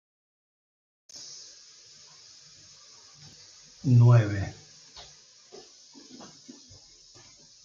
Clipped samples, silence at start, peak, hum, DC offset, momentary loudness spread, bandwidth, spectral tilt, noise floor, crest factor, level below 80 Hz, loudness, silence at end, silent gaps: under 0.1%; 1.15 s; -8 dBFS; none; under 0.1%; 29 LU; 7.4 kHz; -7 dB/octave; -54 dBFS; 22 dB; -66 dBFS; -23 LUFS; 3.1 s; none